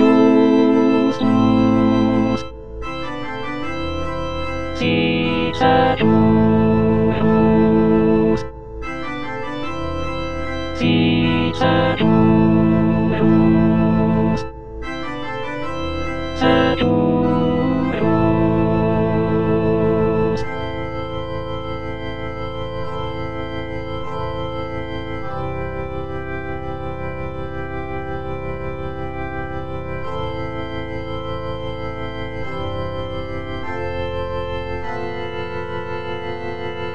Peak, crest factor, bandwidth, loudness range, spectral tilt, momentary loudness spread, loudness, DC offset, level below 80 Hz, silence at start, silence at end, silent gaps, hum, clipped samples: -2 dBFS; 18 dB; 7.2 kHz; 11 LU; -8 dB/octave; 13 LU; -19 LUFS; 3%; -36 dBFS; 0 s; 0 s; none; none; under 0.1%